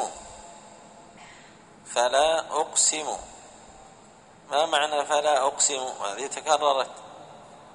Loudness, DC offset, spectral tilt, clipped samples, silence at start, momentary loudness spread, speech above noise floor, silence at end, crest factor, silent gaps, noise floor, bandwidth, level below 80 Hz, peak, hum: -24 LUFS; under 0.1%; 0 dB/octave; under 0.1%; 0 s; 23 LU; 27 dB; 0.05 s; 22 dB; none; -52 dBFS; 10.5 kHz; -64 dBFS; -6 dBFS; none